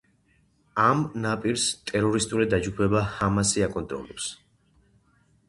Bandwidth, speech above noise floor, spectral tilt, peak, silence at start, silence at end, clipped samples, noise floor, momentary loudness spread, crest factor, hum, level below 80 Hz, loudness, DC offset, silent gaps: 11.5 kHz; 40 dB; -4.5 dB/octave; -6 dBFS; 0.75 s; 1.15 s; under 0.1%; -65 dBFS; 11 LU; 20 dB; none; -48 dBFS; -25 LUFS; under 0.1%; none